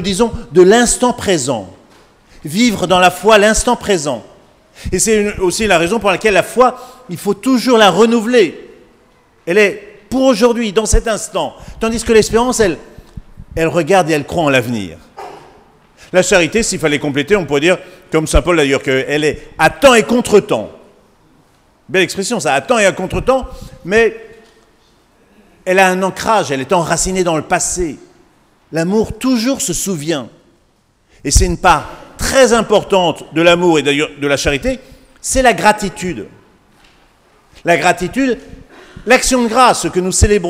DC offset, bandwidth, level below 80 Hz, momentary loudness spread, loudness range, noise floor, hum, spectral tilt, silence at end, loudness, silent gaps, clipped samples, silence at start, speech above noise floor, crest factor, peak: under 0.1%; 16.5 kHz; -30 dBFS; 13 LU; 4 LU; -55 dBFS; none; -4 dB/octave; 0 s; -13 LUFS; none; 0.2%; 0 s; 43 dB; 14 dB; 0 dBFS